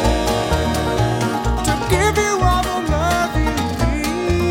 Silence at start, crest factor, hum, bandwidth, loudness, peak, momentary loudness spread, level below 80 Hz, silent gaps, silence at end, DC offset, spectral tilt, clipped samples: 0 s; 16 dB; none; 17 kHz; -18 LUFS; -2 dBFS; 3 LU; -24 dBFS; none; 0 s; under 0.1%; -5 dB/octave; under 0.1%